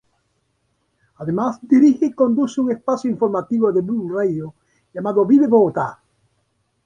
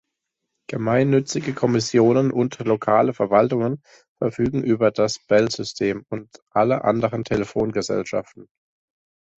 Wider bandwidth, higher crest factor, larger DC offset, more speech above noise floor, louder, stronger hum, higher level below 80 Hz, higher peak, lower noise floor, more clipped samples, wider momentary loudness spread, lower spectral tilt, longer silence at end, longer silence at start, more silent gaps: second, 7.4 kHz vs 8.2 kHz; about the same, 16 dB vs 18 dB; neither; second, 51 dB vs 59 dB; first, -18 LUFS vs -21 LUFS; neither; second, -62 dBFS vs -54 dBFS; about the same, -4 dBFS vs -4 dBFS; second, -68 dBFS vs -80 dBFS; neither; first, 14 LU vs 9 LU; first, -8 dB/octave vs -6 dB/octave; about the same, 0.9 s vs 0.95 s; first, 1.2 s vs 0.7 s; second, none vs 4.08-4.16 s, 6.42-6.46 s